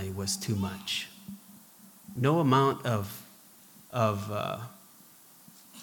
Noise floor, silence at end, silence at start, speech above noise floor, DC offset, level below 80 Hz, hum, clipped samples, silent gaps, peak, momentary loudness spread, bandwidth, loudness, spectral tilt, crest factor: -55 dBFS; 0 s; 0 s; 27 dB; under 0.1%; -74 dBFS; none; under 0.1%; none; -12 dBFS; 22 LU; 19.5 kHz; -30 LUFS; -5 dB/octave; 20 dB